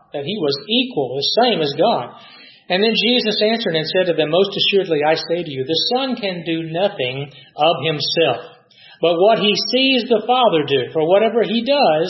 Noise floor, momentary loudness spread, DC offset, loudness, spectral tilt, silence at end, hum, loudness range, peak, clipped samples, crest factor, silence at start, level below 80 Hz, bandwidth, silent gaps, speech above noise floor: -46 dBFS; 8 LU; under 0.1%; -17 LUFS; -5.5 dB/octave; 0 s; none; 3 LU; -2 dBFS; under 0.1%; 16 dB; 0.15 s; -68 dBFS; 6 kHz; none; 29 dB